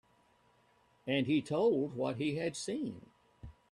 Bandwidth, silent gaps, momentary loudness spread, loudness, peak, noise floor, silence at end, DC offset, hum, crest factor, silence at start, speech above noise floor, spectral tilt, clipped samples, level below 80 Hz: 11.5 kHz; none; 24 LU; -34 LUFS; -18 dBFS; -69 dBFS; 0.2 s; under 0.1%; none; 18 dB; 1.05 s; 36 dB; -5.5 dB/octave; under 0.1%; -66 dBFS